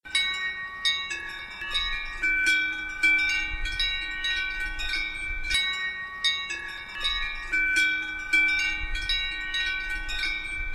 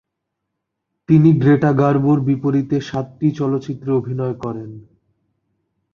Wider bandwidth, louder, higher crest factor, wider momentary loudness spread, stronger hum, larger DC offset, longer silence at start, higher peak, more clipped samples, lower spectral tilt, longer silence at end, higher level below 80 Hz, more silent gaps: first, 14 kHz vs 6.8 kHz; second, -26 LUFS vs -17 LUFS; about the same, 18 dB vs 16 dB; second, 9 LU vs 14 LU; neither; neither; second, 0.05 s vs 1.1 s; second, -10 dBFS vs -2 dBFS; neither; second, -0.5 dB/octave vs -9.5 dB/octave; second, 0 s vs 1.15 s; first, -40 dBFS vs -54 dBFS; neither